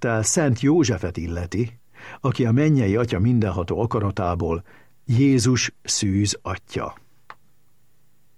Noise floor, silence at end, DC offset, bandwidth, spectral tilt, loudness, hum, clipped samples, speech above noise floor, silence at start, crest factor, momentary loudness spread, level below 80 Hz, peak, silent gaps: -65 dBFS; 1.05 s; 0.3%; 12.5 kHz; -5.5 dB/octave; -22 LUFS; none; under 0.1%; 44 dB; 0 s; 16 dB; 11 LU; -46 dBFS; -6 dBFS; none